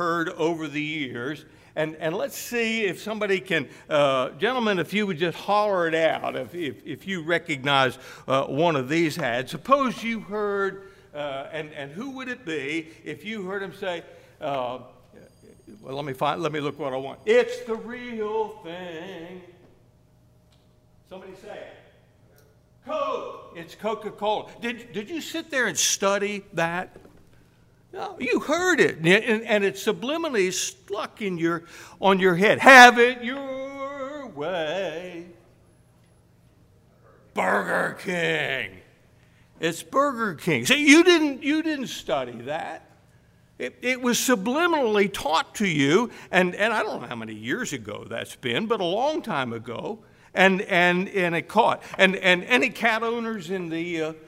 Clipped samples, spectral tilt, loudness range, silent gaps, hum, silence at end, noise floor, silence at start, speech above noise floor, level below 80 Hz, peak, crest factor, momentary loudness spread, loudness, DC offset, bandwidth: under 0.1%; -3.5 dB/octave; 15 LU; none; none; 0.05 s; -58 dBFS; 0 s; 34 dB; -62 dBFS; 0 dBFS; 24 dB; 15 LU; -23 LUFS; under 0.1%; 16 kHz